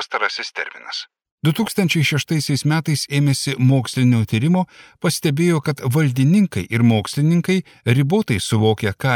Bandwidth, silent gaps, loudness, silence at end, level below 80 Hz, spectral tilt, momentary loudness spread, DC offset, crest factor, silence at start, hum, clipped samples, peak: 18 kHz; 1.31-1.38 s; -18 LUFS; 0 s; -54 dBFS; -5.5 dB/octave; 8 LU; under 0.1%; 14 dB; 0 s; none; under 0.1%; -4 dBFS